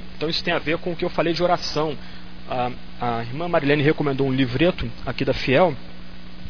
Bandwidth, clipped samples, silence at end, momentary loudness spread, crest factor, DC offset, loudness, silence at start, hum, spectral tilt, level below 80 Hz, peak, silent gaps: 5.4 kHz; under 0.1%; 0 s; 17 LU; 18 dB; 3%; -22 LUFS; 0 s; 60 Hz at -40 dBFS; -6.5 dB/octave; -42 dBFS; -4 dBFS; none